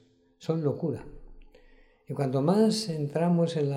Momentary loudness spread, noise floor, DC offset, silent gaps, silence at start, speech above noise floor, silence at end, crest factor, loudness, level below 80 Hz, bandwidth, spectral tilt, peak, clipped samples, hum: 13 LU; -58 dBFS; under 0.1%; none; 0.4 s; 31 dB; 0 s; 16 dB; -27 LUFS; -56 dBFS; 13.5 kHz; -7 dB/octave; -12 dBFS; under 0.1%; none